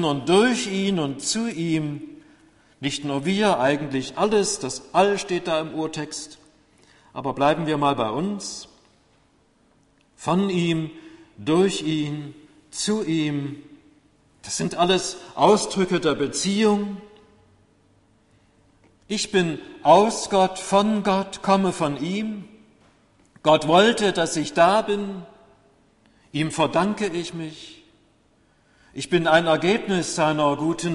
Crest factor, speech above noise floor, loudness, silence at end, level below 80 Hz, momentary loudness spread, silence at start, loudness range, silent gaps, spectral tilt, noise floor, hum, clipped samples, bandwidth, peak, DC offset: 20 dB; 39 dB; -22 LUFS; 0 s; -58 dBFS; 15 LU; 0 s; 6 LU; none; -4.5 dB/octave; -61 dBFS; none; under 0.1%; 11.5 kHz; -2 dBFS; under 0.1%